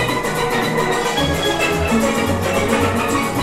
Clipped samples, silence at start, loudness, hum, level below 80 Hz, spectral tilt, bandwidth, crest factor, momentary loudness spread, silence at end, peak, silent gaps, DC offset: under 0.1%; 0 s; -17 LUFS; none; -34 dBFS; -4.5 dB/octave; 16.5 kHz; 14 dB; 2 LU; 0 s; -4 dBFS; none; under 0.1%